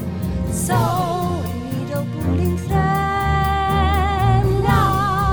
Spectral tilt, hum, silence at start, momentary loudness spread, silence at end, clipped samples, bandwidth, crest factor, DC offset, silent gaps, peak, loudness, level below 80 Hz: -6 dB/octave; none; 0 s; 8 LU; 0 s; under 0.1%; over 20 kHz; 16 dB; under 0.1%; none; -2 dBFS; -19 LUFS; -28 dBFS